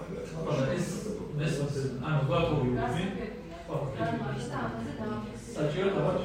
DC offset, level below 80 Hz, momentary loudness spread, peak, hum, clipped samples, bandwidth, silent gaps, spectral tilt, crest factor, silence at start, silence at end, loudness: under 0.1%; -50 dBFS; 9 LU; -16 dBFS; none; under 0.1%; 15 kHz; none; -6.5 dB/octave; 16 dB; 0 s; 0 s; -32 LUFS